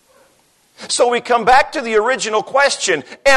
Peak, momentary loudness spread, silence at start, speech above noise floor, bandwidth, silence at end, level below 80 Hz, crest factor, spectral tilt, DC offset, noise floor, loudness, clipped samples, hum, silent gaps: -2 dBFS; 6 LU; 0.8 s; 41 dB; 12.5 kHz; 0 s; -46 dBFS; 14 dB; -1.5 dB/octave; under 0.1%; -56 dBFS; -15 LUFS; under 0.1%; none; none